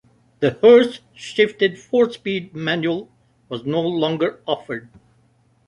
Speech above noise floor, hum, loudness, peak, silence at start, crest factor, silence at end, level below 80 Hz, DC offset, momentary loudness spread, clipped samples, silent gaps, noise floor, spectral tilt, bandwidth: 40 dB; none; -19 LUFS; -2 dBFS; 0.4 s; 18 dB; 0.9 s; -62 dBFS; under 0.1%; 17 LU; under 0.1%; none; -59 dBFS; -6 dB/octave; 9.8 kHz